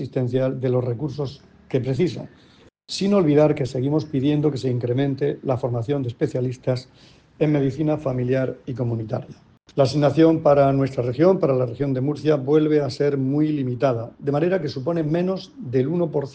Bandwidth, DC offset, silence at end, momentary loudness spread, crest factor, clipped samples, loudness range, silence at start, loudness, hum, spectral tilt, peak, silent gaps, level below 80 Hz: 9 kHz; under 0.1%; 0 s; 10 LU; 16 dB; under 0.1%; 5 LU; 0 s; -22 LUFS; none; -8 dB/octave; -4 dBFS; none; -54 dBFS